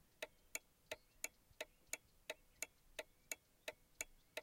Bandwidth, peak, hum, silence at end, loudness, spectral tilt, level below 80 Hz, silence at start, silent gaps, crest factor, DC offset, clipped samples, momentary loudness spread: 16.5 kHz; -24 dBFS; none; 0 s; -53 LUFS; 0 dB/octave; -76 dBFS; 0.2 s; none; 30 dB; under 0.1%; under 0.1%; 5 LU